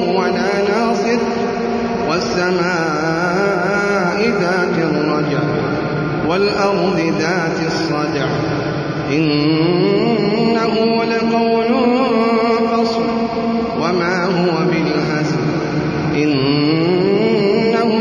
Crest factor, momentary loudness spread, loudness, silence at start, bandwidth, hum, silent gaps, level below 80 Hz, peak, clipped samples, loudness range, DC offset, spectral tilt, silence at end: 12 dB; 4 LU; -16 LUFS; 0 s; 10.5 kHz; none; none; -46 dBFS; -4 dBFS; under 0.1%; 2 LU; under 0.1%; -6 dB/octave; 0 s